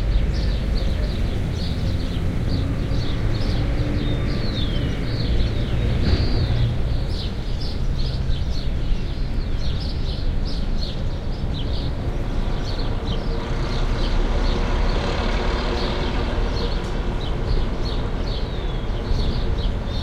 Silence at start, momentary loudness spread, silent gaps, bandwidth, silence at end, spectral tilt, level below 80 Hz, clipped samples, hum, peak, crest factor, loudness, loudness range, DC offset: 0 s; 4 LU; none; 9.2 kHz; 0 s; -6.5 dB/octave; -24 dBFS; under 0.1%; none; -8 dBFS; 14 dB; -25 LUFS; 4 LU; under 0.1%